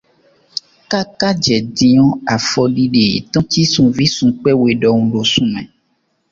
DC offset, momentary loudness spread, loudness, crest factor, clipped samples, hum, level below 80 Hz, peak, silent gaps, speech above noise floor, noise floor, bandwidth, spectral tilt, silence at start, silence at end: under 0.1%; 9 LU; -13 LUFS; 14 dB; under 0.1%; none; -46 dBFS; 0 dBFS; none; 50 dB; -64 dBFS; 7.6 kHz; -5 dB/octave; 0.55 s; 0.65 s